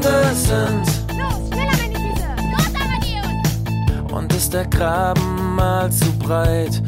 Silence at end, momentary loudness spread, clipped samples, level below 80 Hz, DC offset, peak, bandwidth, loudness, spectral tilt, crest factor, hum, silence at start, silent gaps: 0 s; 5 LU; under 0.1%; -26 dBFS; under 0.1%; -2 dBFS; 16.5 kHz; -19 LUFS; -5 dB/octave; 14 dB; none; 0 s; none